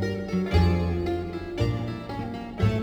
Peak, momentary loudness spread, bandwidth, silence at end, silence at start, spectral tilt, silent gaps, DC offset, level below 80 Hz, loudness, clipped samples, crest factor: -10 dBFS; 11 LU; 9 kHz; 0 s; 0 s; -8 dB/octave; none; under 0.1%; -36 dBFS; -27 LUFS; under 0.1%; 16 dB